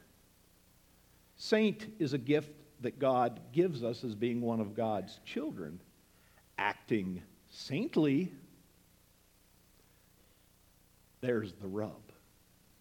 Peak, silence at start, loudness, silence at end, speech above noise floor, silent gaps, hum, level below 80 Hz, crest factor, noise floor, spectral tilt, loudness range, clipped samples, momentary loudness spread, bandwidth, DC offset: -14 dBFS; 1.4 s; -35 LUFS; 0.8 s; 32 dB; none; 60 Hz at -65 dBFS; -72 dBFS; 24 dB; -66 dBFS; -6.5 dB/octave; 9 LU; under 0.1%; 16 LU; 18.5 kHz; under 0.1%